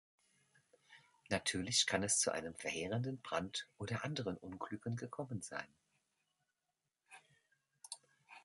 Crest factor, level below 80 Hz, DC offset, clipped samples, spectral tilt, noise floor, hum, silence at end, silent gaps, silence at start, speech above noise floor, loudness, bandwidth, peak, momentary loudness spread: 24 dB; -70 dBFS; under 0.1%; under 0.1%; -3 dB/octave; -89 dBFS; none; 0.05 s; none; 0.9 s; 49 dB; -39 LUFS; 11.5 kHz; -18 dBFS; 15 LU